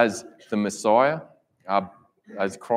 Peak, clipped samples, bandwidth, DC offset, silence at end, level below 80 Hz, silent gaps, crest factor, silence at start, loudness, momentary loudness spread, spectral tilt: -4 dBFS; under 0.1%; 15 kHz; under 0.1%; 0 s; -72 dBFS; none; 20 dB; 0 s; -24 LUFS; 21 LU; -5 dB/octave